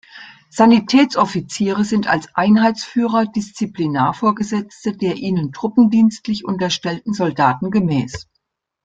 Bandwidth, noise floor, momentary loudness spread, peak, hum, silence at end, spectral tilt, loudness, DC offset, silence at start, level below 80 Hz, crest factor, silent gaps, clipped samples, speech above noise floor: 9 kHz; -72 dBFS; 10 LU; -2 dBFS; none; 0.65 s; -6 dB/octave; -17 LUFS; under 0.1%; 0.15 s; -54 dBFS; 16 dB; none; under 0.1%; 55 dB